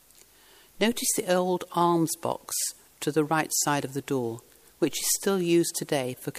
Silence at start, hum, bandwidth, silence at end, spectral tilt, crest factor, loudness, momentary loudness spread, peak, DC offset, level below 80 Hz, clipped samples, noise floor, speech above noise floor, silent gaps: 0.8 s; none; 15.5 kHz; 0 s; -3.5 dB/octave; 18 dB; -27 LUFS; 7 LU; -10 dBFS; under 0.1%; -66 dBFS; under 0.1%; -56 dBFS; 30 dB; none